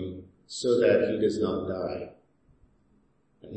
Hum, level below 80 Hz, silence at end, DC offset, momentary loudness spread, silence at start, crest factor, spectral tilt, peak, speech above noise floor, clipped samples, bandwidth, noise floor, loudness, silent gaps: none; -62 dBFS; 0 s; under 0.1%; 18 LU; 0 s; 18 dB; -5.5 dB/octave; -10 dBFS; 40 dB; under 0.1%; 8.8 kHz; -66 dBFS; -27 LUFS; none